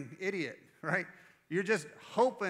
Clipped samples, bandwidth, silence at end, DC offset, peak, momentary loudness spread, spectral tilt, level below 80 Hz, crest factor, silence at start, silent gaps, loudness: under 0.1%; 14 kHz; 0 s; under 0.1%; -16 dBFS; 10 LU; -5 dB/octave; -86 dBFS; 20 dB; 0 s; none; -35 LUFS